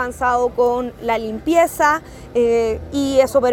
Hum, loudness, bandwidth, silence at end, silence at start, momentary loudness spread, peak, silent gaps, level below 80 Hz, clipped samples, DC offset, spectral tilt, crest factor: none; -18 LUFS; 18 kHz; 0 s; 0 s; 7 LU; -2 dBFS; none; -40 dBFS; under 0.1%; under 0.1%; -4.5 dB/octave; 16 dB